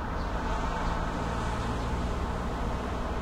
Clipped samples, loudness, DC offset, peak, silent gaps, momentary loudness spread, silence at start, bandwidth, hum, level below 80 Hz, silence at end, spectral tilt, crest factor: under 0.1%; -32 LUFS; under 0.1%; -18 dBFS; none; 2 LU; 0 s; 12 kHz; none; -34 dBFS; 0 s; -6 dB/octave; 12 dB